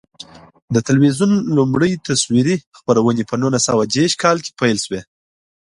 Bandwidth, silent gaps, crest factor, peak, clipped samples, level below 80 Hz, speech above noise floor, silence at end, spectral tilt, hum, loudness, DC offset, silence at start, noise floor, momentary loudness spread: 11.5 kHz; 2.67-2.72 s; 16 dB; 0 dBFS; under 0.1%; -52 dBFS; 24 dB; 0.7 s; -5 dB/octave; none; -16 LUFS; under 0.1%; 0.7 s; -40 dBFS; 6 LU